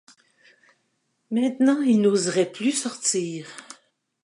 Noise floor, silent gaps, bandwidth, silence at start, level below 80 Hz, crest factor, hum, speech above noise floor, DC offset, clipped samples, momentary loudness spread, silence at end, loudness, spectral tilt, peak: -72 dBFS; none; 11.5 kHz; 1.3 s; -76 dBFS; 16 dB; none; 50 dB; under 0.1%; under 0.1%; 15 LU; 0.5 s; -22 LUFS; -4 dB/octave; -8 dBFS